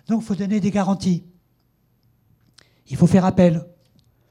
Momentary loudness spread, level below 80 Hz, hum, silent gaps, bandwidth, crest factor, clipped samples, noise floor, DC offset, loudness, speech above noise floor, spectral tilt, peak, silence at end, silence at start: 11 LU; -52 dBFS; none; none; 11 kHz; 18 dB; under 0.1%; -64 dBFS; under 0.1%; -19 LUFS; 46 dB; -8 dB/octave; -2 dBFS; 0.65 s; 0.1 s